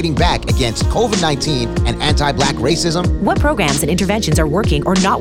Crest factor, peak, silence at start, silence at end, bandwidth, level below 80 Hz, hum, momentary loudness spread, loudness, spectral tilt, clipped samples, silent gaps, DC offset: 12 dB; -2 dBFS; 0 s; 0 s; 17 kHz; -22 dBFS; none; 2 LU; -15 LUFS; -5 dB/octave; under 0.1%; none; 1%